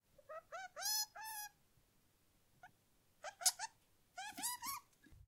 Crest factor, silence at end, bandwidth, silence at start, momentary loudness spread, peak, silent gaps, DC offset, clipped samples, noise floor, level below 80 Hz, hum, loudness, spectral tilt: 32 dB; 0.05 s; 16 kHz; 0.3 s; 18 LU; -16 dBFS; none; under 0.1%; under 0.1%; -75 dBFS; -78 dBFS; none; -42 LUFS; 1.5 dB/octave